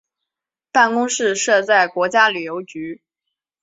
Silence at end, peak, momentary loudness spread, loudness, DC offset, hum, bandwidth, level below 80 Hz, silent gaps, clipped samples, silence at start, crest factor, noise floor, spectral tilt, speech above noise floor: 0.7 s; -2 dBFS; 15 LU; -16 LUFS; under 0.1%; none; 8 kHz; -70 dBFS; none; under 0.1%; 0.75 s; 18 dB; -86 dBFS; -2 dB/octave; 69 dB